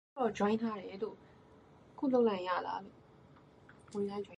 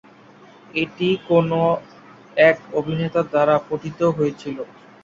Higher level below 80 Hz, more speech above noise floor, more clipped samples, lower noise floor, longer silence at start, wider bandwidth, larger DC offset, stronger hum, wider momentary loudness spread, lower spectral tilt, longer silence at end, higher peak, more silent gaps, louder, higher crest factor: second, -72 dBFS vs -58 dBFS; about the same, 26 dB vs 28 dB; neither; first, -60 dBFS vs -47 dBFS; second, 0.15 s vs 0.75 s; first, 10.5 kHz vs 7.6 kHz; neither; neither; about the same, 14 LU vs 13 LU; about the same, -6.5 dB/octave vs -7.5 dB/octave; second, 0.05 s vs 0.4 s; second, -20 dBFS vs -2 dBFS; neither; second, -36 LUFS vs -20 LUFS; about the same, 18 dB vs 18 dB